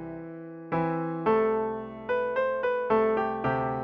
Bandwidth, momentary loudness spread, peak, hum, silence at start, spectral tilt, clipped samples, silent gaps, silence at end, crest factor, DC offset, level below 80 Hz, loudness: 5.4 kHz; 13 LU; -12 dBFS; none; 0 s; -9 dB/octave; under 0.1%; none; 0 s; 16 dB; under 0.1%; -58 dBFS; -28 LUFS